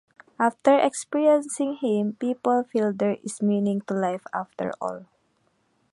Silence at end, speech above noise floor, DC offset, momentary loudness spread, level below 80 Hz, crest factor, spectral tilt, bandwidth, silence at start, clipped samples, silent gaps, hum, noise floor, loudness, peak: 0.9 s; 44 dB; under 0.1%; 11 LU; -74 dBFS; 20 dB; -5.5 dB/octave; 11.5 kHz; 0.4 s; under 0.1%; none; none; -68 dBFS; -24 LUFS; -4 dBFS